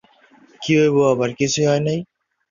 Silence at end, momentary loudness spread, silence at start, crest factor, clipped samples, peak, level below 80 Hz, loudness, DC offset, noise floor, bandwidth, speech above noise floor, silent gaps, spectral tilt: 0.45 s; 10 LU; 0.6 s; 14 dB; under 0.1%; -4 dBFS; -58 dBFS; -18 LUFS; under 0.1%; -52 dBFS; 7.4 kHz; 35 dB; none; -5 dB/octave